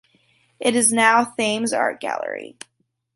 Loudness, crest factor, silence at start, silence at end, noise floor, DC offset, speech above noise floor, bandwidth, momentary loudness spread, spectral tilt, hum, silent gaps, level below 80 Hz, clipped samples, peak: -19 LUFS; 22 dB; 0.6 s; 0.65 s; -61 dBFS; under 0.1%; 41 dB; 11.5 kHz; 15 LU; -2 dB/octave; none; none; -72 dBFS; under 0.1%; 0 dBFS